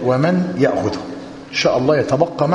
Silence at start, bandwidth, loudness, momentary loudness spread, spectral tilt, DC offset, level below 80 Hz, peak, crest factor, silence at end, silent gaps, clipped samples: 0 s; 10.5 kHz; -17 LUFS; 11 LU; -6 dB/octave; under 0.1%; -50 dBFS; 0 dBFS; 16 dB; 0 s; none; under 0.1%